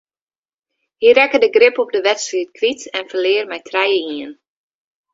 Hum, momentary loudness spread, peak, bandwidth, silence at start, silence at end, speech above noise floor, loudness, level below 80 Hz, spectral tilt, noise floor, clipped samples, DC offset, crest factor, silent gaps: none; 12 LU; 0 dBFS; 7.8 kHz; 1 s; 0.8 s; 65 dB; -15 LUFS; -66 dBFS; -1.5 dB/octave; -80 dBFS; under 0.1%; under 0.1%; 18 dB; none